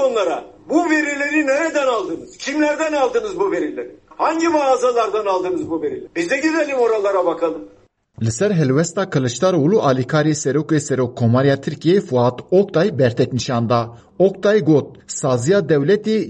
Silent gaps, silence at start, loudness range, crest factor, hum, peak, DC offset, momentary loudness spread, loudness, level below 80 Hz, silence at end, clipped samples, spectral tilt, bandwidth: none; 0 s; 2 LU; 14 dB; none; -4 dBFS; under 0.1%; 8 LU; -18 LUFS; -56 dBFS; 0 s; under 0.1%; -6 dB/octave; 10 kHz